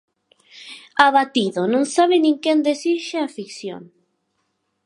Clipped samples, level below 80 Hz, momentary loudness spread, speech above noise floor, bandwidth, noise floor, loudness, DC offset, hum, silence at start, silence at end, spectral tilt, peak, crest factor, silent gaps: under 0.1%; -72 dBFS; 18 LU; 53 dB; 11 kHz; -71 dBFS; -18 LUFS; under 0.1%; none; 0.55 s; 1 s; -4 dB/octave; 0 dBFS; 20 dB; none